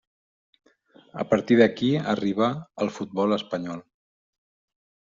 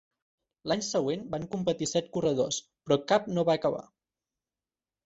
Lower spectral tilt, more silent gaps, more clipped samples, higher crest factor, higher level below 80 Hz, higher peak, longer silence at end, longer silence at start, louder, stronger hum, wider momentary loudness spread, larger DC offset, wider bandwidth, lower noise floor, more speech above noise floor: about the same, -5 dB/octave vs -4.5 dB/octave; neither; neither; about the same, 22 dB vs 22 dB; about the same, -66 dBFS vs -66 dBFS; first, -4 dBFS vs -10 dBFS; about the same, 1.3 s vs 1.2 s; first, 1.15 s vs 0.65 s; first, -24 LUFS vs -29 LUFS; neither; first, 15 LU vs 9 LU; neither; about the same, 7.6 kHz vs 8.2 kHz; second, -55 dBFS vs under -90 dBFS; second, 31 dB vs over 61 dB